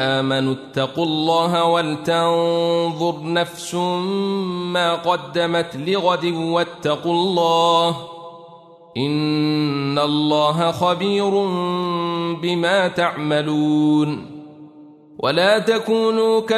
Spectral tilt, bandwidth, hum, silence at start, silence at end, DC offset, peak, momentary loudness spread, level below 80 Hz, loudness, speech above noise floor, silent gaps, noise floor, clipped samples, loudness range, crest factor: -5.5 dB/octave; 13.5 kHz; none; 0 s; 0 s; under 0.1%; -4 dBFS; 7 LU; -64 dBFS; -19 LUFS; 25 dB; none; -44 dBFS; under 0.1%; 1 LU; 16 dB